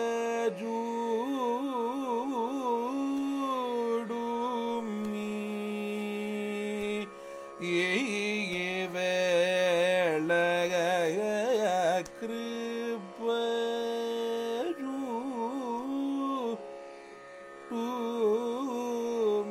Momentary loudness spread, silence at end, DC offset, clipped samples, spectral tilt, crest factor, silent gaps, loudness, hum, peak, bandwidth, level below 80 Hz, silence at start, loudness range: 9 LU; 0 s; under 0.1%; under 0.1%; -4.5 dB/octave; 14 dB; none; -31 LUFS; none; -16 dBFS; 16 kHz; -74 dBFS; 0 s; 6 LU